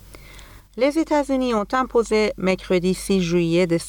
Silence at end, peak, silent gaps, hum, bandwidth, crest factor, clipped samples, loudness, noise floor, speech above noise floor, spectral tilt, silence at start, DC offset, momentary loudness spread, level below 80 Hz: 0 s; -6 dBFS; none; none; 19.5 kHz; 14 dB; under 0.1%; -21 LUFS; -43 dBFS; 23 dB; -5.5 dB/octave; 0.1 s; under 0.1%; 3 LU; -44 dBFS